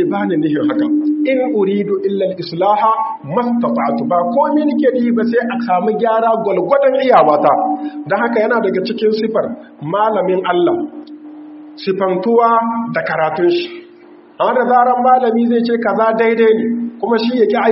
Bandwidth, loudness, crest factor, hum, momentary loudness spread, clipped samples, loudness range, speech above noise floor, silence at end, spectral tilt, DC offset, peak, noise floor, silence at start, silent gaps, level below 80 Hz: 5.8 kHz; -14 LUFS; 14 dB; none; 8 LU; under 0.1%; 3 LU; 27 dB; 0 s; -4.5 dB/octave; under 0.1%; 0 dBFS; -41 dBFS; 0 s; none; -66 dBFS